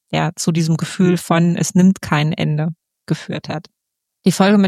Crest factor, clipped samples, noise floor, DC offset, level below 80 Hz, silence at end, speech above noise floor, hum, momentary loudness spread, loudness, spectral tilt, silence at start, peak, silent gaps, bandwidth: 16 dB; under 0.1%; -66 dBFS; under 0.1%; -54 dBFS; 0 s; 50 dB; none; 12 LU; -17 LUFS; -6 dB/octave; 0.1 s; -2 dBFS; none; 14.5 kHz